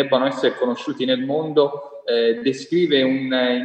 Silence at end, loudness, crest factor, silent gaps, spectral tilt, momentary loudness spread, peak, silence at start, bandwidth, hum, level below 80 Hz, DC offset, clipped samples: 0 s; -20 LUFS; 16 dB; none; -5.5 dB/octave; 6 LU; -4 dBFS; 0 s; 8.6 kHz; none; -72 dBFS; under 0.1%; under 0.1%